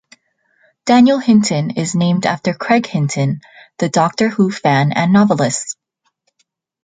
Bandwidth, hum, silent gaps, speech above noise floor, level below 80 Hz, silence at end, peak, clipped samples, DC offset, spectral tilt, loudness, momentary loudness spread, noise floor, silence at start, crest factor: 9.6 kHz; none; none; 52 dB; -58 dBFS; 1.1 s; -2 dBFS; under 0.1%; under 0.1%; -5.5 dB/octave; -15 LUFS; 11 LU; -66 dBFS; 0.85 s; 14 dB